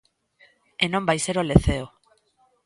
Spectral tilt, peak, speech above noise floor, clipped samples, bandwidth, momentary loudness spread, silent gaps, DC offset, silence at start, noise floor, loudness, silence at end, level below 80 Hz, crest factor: -5 dB/octave; 0 dBFS; 43 dB; under 0.1%; 11.5 kHz; 17 LU; none; under 0.1%; 0.8 s; -65 dBFS; -23 LUFS; 0.8 s; -36 dBFS; 24 dB